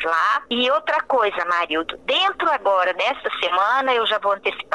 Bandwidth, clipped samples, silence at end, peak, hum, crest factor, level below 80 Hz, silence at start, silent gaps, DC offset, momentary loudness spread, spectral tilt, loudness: 11.5 kHz; under 0.1%; 0 s; -4 dBFS; none; 16 dB; -60 dBFS; 0 s; none; 0.1%; 4 LU; -2.5 dB/octave; -20 LUFS